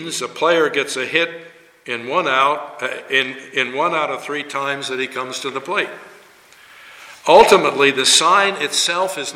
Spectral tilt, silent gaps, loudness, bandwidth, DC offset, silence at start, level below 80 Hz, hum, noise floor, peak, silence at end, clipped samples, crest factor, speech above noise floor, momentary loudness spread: -1.5 dB/octave; none; -17 LUFS; 16.5 kHz; under 0.1%; 0 s; -58 dBFS; none; -47 dBFS; 0 dBFS; 0 s; under 0.1%; 18 dB; 29 dB; 13 LU